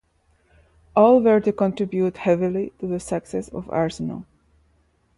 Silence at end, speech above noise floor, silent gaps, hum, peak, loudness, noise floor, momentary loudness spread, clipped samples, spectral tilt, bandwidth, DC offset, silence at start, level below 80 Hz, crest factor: 0.95 s; 43 dB; none; none; -4 dBFS; -21 LUFS; -63 dBFS; 15 LU; under 0.1%; -7.5 dB/octave; 11.5 kHz; under 0.1%; 0.95 s; -54 dBFS; 18 dB